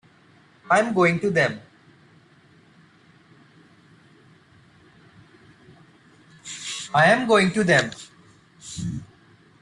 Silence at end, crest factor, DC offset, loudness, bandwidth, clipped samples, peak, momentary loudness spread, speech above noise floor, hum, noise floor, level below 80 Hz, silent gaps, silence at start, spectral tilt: 0.55 s; 22 dB; under 0.1%; -21 LUFS; 11.5 kHz; under 0.1%; -4 dBFS; 23 LU; 35 dB; none; -55 dBFS; -60 dBFS; none; 0.7 s; -5 dB/octave